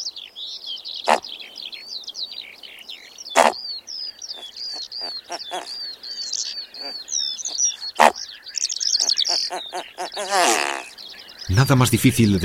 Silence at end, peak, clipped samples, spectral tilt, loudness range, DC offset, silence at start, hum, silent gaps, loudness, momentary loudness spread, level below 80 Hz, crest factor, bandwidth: 0 s; 0 dBFS; under 0.1%; -3.5 dB/octave; 8 LU; under 0.1%; 0 s; none; none; -22 LUFS; 16 LU; -50 dBFS; 24 dB; 16.5 kHz